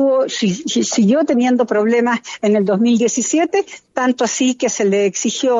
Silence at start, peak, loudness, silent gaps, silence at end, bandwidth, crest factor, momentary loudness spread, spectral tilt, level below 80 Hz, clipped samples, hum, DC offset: 0 s; -4 dBFS; -16 LUFS; none; 0 s; 8 kHz; 12 dB; 5 LU; -4 dB/octave; -64 dBFS; under 0.1%; none; under 0.1%